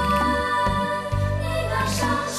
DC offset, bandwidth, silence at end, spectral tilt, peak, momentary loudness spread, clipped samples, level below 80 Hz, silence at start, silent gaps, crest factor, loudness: under 0.1%; 15 kHz; 0 s; -5 dB/octave; -8 dBFS; 4 LU; under 0.1%; -34 dBFS; 0 s; none; 14 dB; -23 LUFS